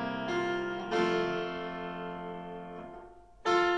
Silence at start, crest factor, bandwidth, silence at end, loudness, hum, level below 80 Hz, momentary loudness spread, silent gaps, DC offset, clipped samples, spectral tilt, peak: 0 s; 18 dB; 9.2 kHz; 0 s; -33 LUFS; none; -62 dBFS; 15 LU; none; under 0.1%; under 0.1%; -5.5 dB/octave; -16 dBFS